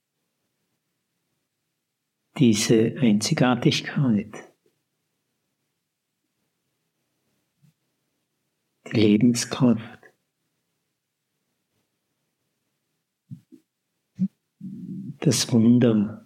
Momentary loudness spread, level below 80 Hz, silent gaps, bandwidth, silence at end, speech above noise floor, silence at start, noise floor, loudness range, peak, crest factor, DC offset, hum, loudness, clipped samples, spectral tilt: 18 LU; -72 dBFS; none; 15.5 kHz; 0.1 s; 59 dB; 2.35 s; -79 dBFS; 14 LU; -6 dBFS; 20 dB; under 0.1%; none; -21 LUFS; under 0.1%; -5.5 dB/octave